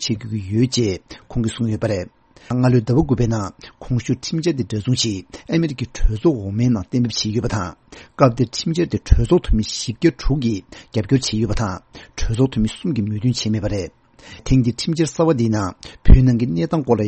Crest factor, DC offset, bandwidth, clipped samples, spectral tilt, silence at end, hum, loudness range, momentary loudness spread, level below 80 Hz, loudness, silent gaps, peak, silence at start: 18 dB; under 0.1%; 8.8 kHz; under 0.1%; -6 dB/octave; 0 s; none; 3 LU; 10 LU; -26 dBFS; -20 LUFS; none; 0 dBFS; 0 s